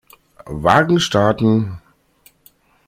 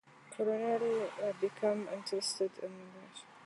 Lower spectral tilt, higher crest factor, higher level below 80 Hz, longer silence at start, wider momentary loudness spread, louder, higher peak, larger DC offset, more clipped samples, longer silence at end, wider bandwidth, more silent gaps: first, -5.5 dB/octave vs -3.5 dB/octave; about the same, 18 dB vs 16 dB; first, -46 dBFS vs -90 dBFS; first, 0.45 s vs 0.15 s; about the same, 16 LU vs 18 LU; first, -16 LUFS vs -36 LUFS; first, 0 dBFS vs -20 dBFS; neither; neither; first, 1.1 s vs 0 s; first, 15.5 kHz vs 11.5 kHz; neither